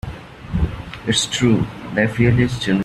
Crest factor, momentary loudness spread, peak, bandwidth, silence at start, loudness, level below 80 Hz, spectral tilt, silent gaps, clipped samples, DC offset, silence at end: 18 dB; 12 LU; -2 dBFS; 12.5 kHz; 0.05 s; -19 LUFS; -34 dBFS; -5 dB/octave; none; under 0.1%; under 0.1%; 0 s